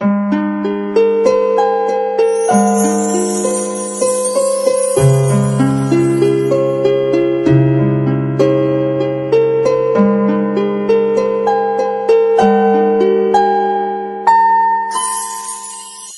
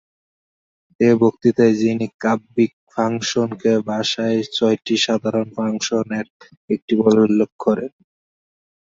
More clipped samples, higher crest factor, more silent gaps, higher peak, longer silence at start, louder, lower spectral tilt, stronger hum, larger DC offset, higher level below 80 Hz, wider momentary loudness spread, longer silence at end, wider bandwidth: neither; second, 12 dB vs 18 dB; second, none vs 2.14-2.19 s, 2.73-2.87 s, 6.30-6.40 s, 6.57-6.68 s, 6.82-6.88 s, 7.52-7.59 s; about the same, 0 dBFS vs -2 dBFS; second, 0 s vs 1 s; first, -13 LUFS vs -19 LUFS; about the same, -6 dB/octave vs -5 dB/octave; neither; neither; first, -50 dBFS vs -62 dBFS; about the same, 6 LU vs 8 LU; second, 0 s vs 0.95 s; first, 11.5 kHz vs 7.8 kHz